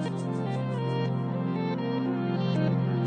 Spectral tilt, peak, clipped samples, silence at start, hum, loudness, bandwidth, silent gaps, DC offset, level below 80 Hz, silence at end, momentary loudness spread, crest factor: -8.5 dB/octave; -14 dBFS; under 0.1%; 0 s; none; -29 LUFS; 9.2 kHz; none; under 0.1%; -68 dBFS; 0 s; 4 LU; 14 dB